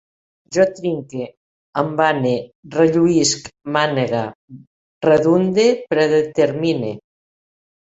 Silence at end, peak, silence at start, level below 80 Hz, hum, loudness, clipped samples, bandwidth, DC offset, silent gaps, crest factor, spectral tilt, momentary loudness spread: 0.95 s; -2 dBFS; 0.5 s; -58 dBFS; none; -18 LUFS; under 0.1%; 8.2 kHz; under 0.1%; 1.37-1.73 s, 2.55-2.63 s, 4.35-4.48 s, 4.67-5.01 s; 16 dB; -5 dB/octave; 13 LU